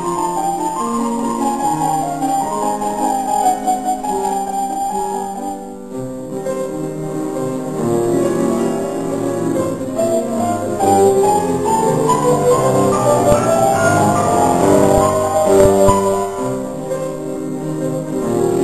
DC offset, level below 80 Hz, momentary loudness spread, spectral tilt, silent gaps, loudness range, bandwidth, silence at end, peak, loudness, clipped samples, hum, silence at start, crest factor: 0.7%; -40 dBFS; 11 LU; -5.5 dB/octave; none; 8 LU; 14 kHz; 0 s; 0 dBFS; -16 LUFS; under 0.1%; none; 0 s; 16 dB